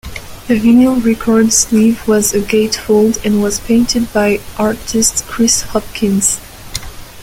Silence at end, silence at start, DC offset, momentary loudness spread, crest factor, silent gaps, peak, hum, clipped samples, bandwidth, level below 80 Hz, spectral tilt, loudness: 0 s; 0.05 s; under 0.1%; 13 LU; 12 dB; none; 0 dBFS; none; under 0.1%; 16.5 kHz; -34 dBFS; -3.5 dB/octave; -12 LUFS